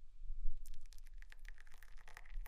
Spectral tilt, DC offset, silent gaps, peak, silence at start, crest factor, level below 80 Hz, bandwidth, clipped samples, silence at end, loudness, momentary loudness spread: -3.5 dB/octave; under 0.1%; none; -22 dBFS; 0 s; 18 dB; -44 dBFS; 6.2 kHz; under 0.1%; 0 s; -57 LUFS; 10 LU